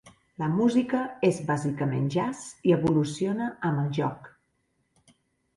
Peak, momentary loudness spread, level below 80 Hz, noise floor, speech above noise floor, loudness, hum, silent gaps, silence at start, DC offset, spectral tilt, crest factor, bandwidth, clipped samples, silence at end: -10 dBFS; 7 LU; -62 dBFS; -73 dBFS; 48 dB; -27 LUFS; none; none; 0.05 s; under 0.1%; -7 dB/octave; 18 dB; 11.5 kHz; under 0.1%; 1.3 s